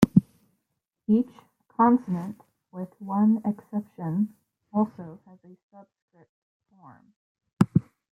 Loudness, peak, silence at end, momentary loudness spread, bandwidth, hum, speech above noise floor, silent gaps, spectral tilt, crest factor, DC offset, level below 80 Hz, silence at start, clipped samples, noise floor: -26 LUFS; -2 dBFS; 0.3 s; 18 LU; 11 kHz; none; 54 dB; 5.63-5.70 s, 6.02-6.08 s, 6.29-6.60 s, 7.16-7.35 s, 7.53-7.57 s; -9 dB/octave; 24 dB; under 0.1%; -62 dBFS; 0 s; under 0.1%; -81 dBFS